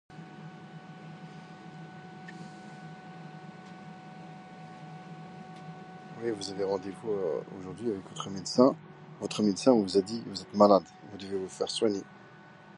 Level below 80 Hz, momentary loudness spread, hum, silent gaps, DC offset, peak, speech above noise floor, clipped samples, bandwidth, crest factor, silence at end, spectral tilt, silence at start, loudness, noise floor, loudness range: -70 dBFS; 22 LU; none; none; under 0.1%; -8 dBFS; 24 dB; under 0.1%; 11 kHz; 24 dB; 0 s; -5.5 dB/octave; 0.1 s; -29 LUFS; -52 dBFS; 19 LU